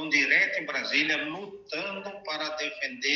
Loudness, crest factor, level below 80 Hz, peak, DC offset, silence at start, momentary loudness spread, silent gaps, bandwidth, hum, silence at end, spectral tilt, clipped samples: -27 LUFS; 20 dB; -74 dBFS; -10 dBFS; under 0.1%; 0 s; 14 LU; none; 7.4 kHz; none; 0 s; -2 dB/octave; under 0.1%